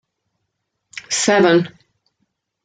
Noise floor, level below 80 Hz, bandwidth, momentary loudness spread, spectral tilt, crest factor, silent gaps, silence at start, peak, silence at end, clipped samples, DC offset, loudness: -75 dBFS; -66 dBFS; 9.6 kHz; 23 LU; -3.5 dB/octave; 18 dB; none; 0.95 s; -2 dBFS; 0.95 s; under 0.1%; under 0.1%; -15 LUFS